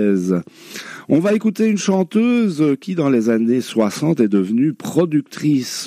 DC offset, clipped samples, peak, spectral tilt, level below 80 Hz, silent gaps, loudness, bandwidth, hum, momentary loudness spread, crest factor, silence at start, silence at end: under 0.1%; under 0.1%; -2 dBFS; -6 dB/octave; -68 dBFS; none; -17 LUFS; 15 kHz; none; 5 LU; 14 dB; 0 s; 0 s